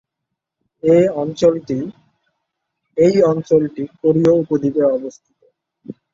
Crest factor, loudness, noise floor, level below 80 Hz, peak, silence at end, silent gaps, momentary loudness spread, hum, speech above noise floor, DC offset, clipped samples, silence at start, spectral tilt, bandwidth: 16 dB; -16 LUFS; -80 dBFS; -56 dBFS; -2 dBFS; 0.2 s; none; 15 LU; none; 64 dB; under 0.1%; under 0.1%; 0.85 s; -8 dB/octave; 7.4 kHz